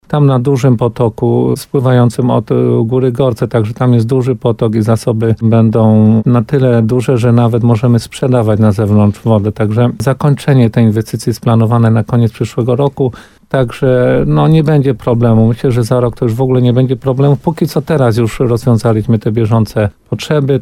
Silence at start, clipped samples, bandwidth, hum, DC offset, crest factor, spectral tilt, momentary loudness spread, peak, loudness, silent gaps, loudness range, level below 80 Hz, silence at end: 0.1 s; under 0.1%; 13 kHz; none; under 0.1%; 10 dB; -8.5 dB/octave; 5 LU; 0 dBFS; -11 LUFS; none; 2 LU; -38 dBFS; 0 s